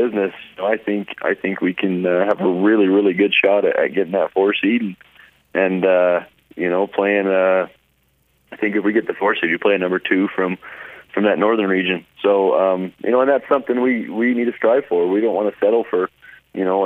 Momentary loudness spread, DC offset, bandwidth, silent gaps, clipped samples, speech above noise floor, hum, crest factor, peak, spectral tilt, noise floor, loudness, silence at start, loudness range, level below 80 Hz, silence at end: 8 LU; under 0.1%; 4 kHz; none; under 0.1%; 44 dB; none; 16 dB; -2 dBFS; -8 dB/octave; -62 dBFS; -18 LUFS; 0 s; 3 LU; -68 dBFS; 0 s